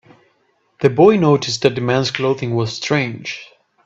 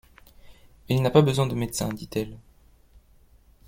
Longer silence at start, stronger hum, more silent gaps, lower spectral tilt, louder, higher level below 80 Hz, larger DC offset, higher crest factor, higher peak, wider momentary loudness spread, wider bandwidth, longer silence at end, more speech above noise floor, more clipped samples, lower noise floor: first, 0.8 s vs 0.5 s; neither; neither; about the same, -5.5 dB/octave vs -6 dB/octave; first, -16 LUFS vs -24 LUFS; about the same, -56 dBFS vs -52 dBFS; neither; about the same, 18 dB vs 22 dB; first, 0 dBFS vs -4 dBFS; about the same, 13 LU vs 12 LU; second, 8 kHz vs 16.5 kHz; second, 0.4 s vs 1.3 s; first, 46 dB vs 33 dB; neither; first, -62 dBFS vs -56 dBFS